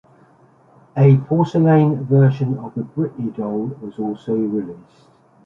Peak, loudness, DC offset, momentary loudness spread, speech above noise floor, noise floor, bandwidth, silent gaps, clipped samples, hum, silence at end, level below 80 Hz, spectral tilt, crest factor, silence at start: -2 dBFS; -18 LUFS; under 0.1%; 13 LU; 34 dB; -52 dBFS; 5.8 kHz; none; under 0.1%; none; 0.65 s; -60 dBFS; -10.5 dB/octave; 16 dB; 0.95 s